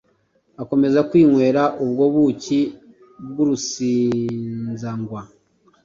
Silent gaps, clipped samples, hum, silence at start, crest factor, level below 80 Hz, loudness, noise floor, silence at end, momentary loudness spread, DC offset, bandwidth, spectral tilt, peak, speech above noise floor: none; under 0.1%; none; 0.6 s; 16 dB; -58 dBFS; -19 LUFS; -63 dBFS; 0.6 s; 16 LU; under 0.1%; 7.6 kHz; -6.5 dB/octave; -4 dBFS; 44 dB